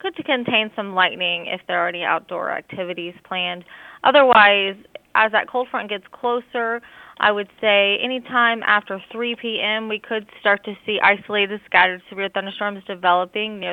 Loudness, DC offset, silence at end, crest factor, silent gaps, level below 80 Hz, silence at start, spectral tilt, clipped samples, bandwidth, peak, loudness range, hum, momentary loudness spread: -19 LUFS; under 0.1%; 0 s; 20 dB; none; -66 dBFS; 0.05 s; -5.5 dB/octave; under 0.1%; 5 kHz; 0 dBFS; 4 LU; none; 11 LU